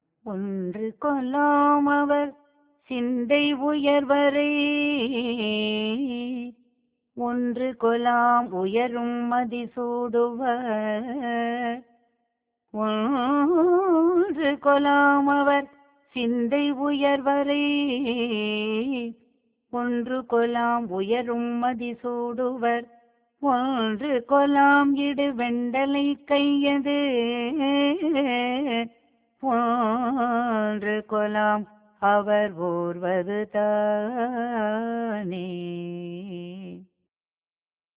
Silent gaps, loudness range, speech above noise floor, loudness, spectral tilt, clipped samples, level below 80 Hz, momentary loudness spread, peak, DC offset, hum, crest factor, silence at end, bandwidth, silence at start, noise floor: none; 5 LU; over 67 dB; -24 LUFS; -9 dB/octave; under 0.1%; -66 dBFS; 11 LU; -8 dBFS; under 0.1%; none; 16 dB; 1.15 s; 4 kHz; 0.25 s; under -90 dBFS